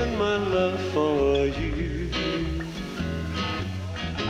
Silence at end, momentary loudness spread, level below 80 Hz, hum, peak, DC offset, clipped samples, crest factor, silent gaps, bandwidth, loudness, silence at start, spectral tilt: 0 s; 9 LU; -36 dBFS; none; -12 dBFS; under 0.1%; under 0.1%; 14 dB; none; 14 kHz; -26 LUFS; 0 s; -6 dB/octave